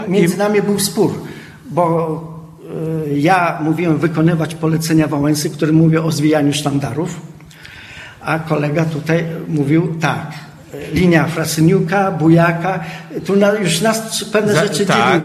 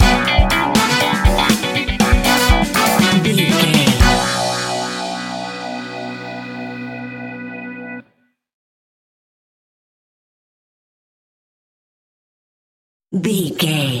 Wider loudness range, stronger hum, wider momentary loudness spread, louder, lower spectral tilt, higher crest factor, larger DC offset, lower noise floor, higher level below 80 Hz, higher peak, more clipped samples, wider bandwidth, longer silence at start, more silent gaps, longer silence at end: second, 4 LU vs 19 LU; second, none vs 60 Hz at -45 dBFS; about the same, 16 LU vs 16 LU; about the same, -15 LUFS vs -15 LUFS; first, -5.5 dB/octave vs -4 dB/octave; about the same, 16 dB vs 18 dB; neither; second, -37 dBFS vs -61 dBFS; second, -48 dBFS vs -26 dBFS; about the same, 0 dBFS vs 0 dBFS; neither; second, 14.5 kHz vs 17 kHz; about the same, 0 s vs 0 s; second, none vs 8.53-13.00 s; about the same, 0 s vs 0 s